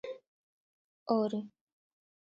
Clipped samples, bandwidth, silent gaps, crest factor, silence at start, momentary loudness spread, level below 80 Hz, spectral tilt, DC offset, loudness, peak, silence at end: under 0.1%; 7.2 kHz; 0.27-1.06 s; 22 dB; 0.05 s; 19 LU; -84 dBFS; -6.5 dB/octave; under 0.1%; -33 LUFS; -18 dBFS; 0.9 s